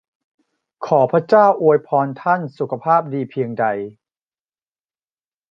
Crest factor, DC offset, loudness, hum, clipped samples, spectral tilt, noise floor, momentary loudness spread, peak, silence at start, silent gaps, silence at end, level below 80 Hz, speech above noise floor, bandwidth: 18 dB; under 0.1%; -17 LUFS; none; under 0.1%; -8.5 dB/octave; under -90 dBFS; 12 LU; -2 dBFS; 0.8 s; none; 1.6 s; -70 dBFS; over 73 dB; 6.6 kHz